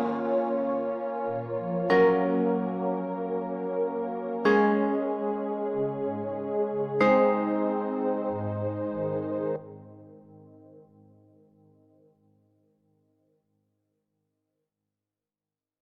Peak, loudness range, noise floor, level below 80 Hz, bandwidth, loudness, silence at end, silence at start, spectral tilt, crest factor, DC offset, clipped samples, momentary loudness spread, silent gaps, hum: -10 dBFS; 9 LU; under -90 dBFS; -72 dBFS; 6.6 kHz; -27 LUFS; 5 s; 0 s; -8.5 dB/octave; 20 dB; under 0.1%; under 0.1%; 10 LU; none; none